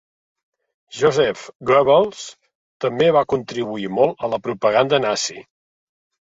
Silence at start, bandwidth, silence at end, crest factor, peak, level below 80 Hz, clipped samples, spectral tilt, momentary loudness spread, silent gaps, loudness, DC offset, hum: 0.95 s; 8 kHz; 0.85 s; 18 dB; -2 dBFS; -58 dBFS; under 0.1%; -4.5 dB/octave; 10 LU; 2.55-2.80 s; -19 LUFS; under 0.1%; none